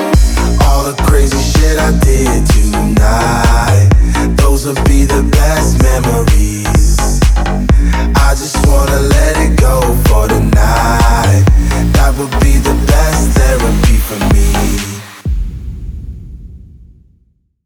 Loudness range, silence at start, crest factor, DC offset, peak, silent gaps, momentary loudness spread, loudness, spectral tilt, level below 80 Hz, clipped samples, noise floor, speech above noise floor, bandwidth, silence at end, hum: 4 LU; 0 s; 8 dB; under 0.1%; 0 dBFS; none; 5 LU; -11 LUFS; -5.5 dB/octave; -12 dBFS; under 0.1%; -54 dBFS; 46 dB; 17.5 kHz; 1.1 s; none